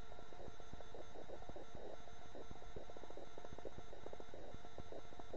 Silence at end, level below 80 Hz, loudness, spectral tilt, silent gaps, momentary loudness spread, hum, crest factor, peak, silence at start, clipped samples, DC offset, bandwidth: 0 s; -62 dBFS; -56 LUFS; -5.5 dB/octave; none; 2 LU; none; 18 dB; -32 dBFS; 0 s; under 0.1%; 0.8%; 8 kHz